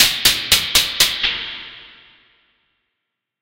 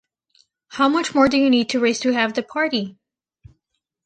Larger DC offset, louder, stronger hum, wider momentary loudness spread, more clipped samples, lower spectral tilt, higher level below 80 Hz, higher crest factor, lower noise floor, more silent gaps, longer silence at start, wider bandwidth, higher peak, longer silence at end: neither; first, -14 LUFS vs -19 LUFS; neither; first, 17 LU vs 8 LU; neither; second, 0.5 dB/octave vs -3.5 dB/octave; first, -44 dBFS vs -58 dBFS; about the same, 20 dB vs 18 dB; about the same, -79 dBFS vs -76 dBFS; neither; second, 0 s vs 0.7 s; first, 16 kHz vs 9.2 kHz; first, 0 dBFS vs -4 dBFS; first, 1.55 s vs 1.15 s